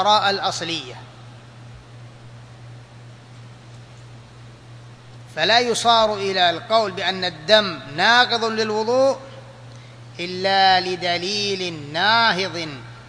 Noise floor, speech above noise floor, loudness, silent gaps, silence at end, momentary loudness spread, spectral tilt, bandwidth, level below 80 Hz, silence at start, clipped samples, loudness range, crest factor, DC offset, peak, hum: -42 dBFS; 23 dB; -19 LUFS; none; 0 s; 15 LU; -3 dB/octave; 11 kHz; -58 dBFS; 0 s; under 0.1%; 9 LU; 22 dB; under 0.1%; 0 dBFS; none